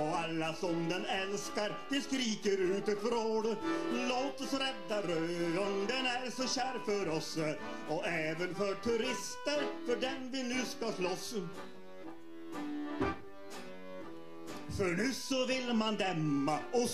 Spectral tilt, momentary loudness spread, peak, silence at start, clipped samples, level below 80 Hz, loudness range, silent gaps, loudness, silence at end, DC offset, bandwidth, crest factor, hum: -4 dB/octave; 14 LU; -18 dBFS; 0 s; under 0.1%; -66 dBFS; 6 LU; none; -35 LUFS; 0 s; 0.4%; 14.5 kHz; 16 dB; none